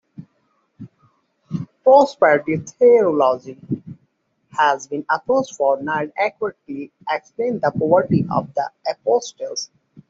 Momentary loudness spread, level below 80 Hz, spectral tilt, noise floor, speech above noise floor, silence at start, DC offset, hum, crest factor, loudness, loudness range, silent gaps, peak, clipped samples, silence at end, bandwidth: 16 LU; -62 dBFS; -5.5 dB/octave; -66 dBFS; 47 dB; 0.2 s; under 0.1%; none; 18 dB; -19 LUFS; 5 LU; none; -2 dBFS; under 0.1%; 0.45 s; 7.6 kHz